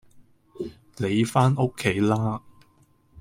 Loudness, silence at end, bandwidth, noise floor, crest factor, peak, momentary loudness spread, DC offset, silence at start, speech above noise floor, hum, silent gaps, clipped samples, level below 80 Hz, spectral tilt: -24 LUFS; 0 s; 16 kHz; -60 dBFS; 20 dB; -6 dBFS; 16 LU; under 0.1%; 0.15 s; 38 dB; none; none; under 0.1%; -56 dBFS; -6.5 dB/octave